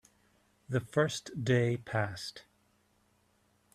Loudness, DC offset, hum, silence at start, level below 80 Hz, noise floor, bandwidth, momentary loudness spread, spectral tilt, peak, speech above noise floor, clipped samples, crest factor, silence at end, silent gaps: -33 LUFS; under 0.1%; none; 0.7 s; -68 dBFS; -71 dBFS; 14 kHz; 9 LU; -5.5 dB/octave; -14 dBFS; 39 dB; under 0.1%; 20 dB; 1.35 s; none